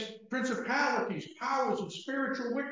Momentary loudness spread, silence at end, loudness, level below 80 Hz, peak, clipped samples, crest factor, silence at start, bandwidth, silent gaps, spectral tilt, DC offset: 7 LU; 0 s; -33 LUFS; -82 dBFS; -18 dBFS; under 0.1%; 16 dB; 0 s; 7.6 kHz; none; -4.5 dB/octave; under 0.1%